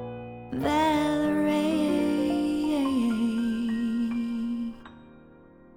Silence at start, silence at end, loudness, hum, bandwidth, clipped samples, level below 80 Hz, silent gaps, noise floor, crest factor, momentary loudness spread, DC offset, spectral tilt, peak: 0 s; 0.6 s; -27 LUFS; none; 17 kHz; under 0.1%; -54 dBFS; none; -52 dBFS; 16 dB; 10 LU; under 0.1%; -6 dB/octave; -12 dBFS